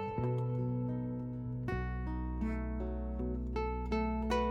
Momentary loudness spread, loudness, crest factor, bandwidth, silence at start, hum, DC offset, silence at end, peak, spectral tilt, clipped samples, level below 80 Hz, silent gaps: 5 LU; -37 LUFS; 16 dB; 8 kHz; 0 s; none; under 0.1%; 0 s; -20 dBFS; -8.5 dB/octave; under 0.1%; -42 dBFS; none